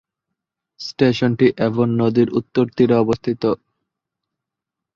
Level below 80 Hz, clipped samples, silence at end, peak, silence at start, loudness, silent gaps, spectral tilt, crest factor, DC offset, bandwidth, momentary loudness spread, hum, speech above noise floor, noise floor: -54 dBFS; under 0.1%; 1.4 s; -2 dBFS; 0.8 s; -18 LUFS; none; -7.5 dB/octave; 18 dB; under 0.1%; 7.4 kHz; 6 LU; none; 67 dB; -84 dBFS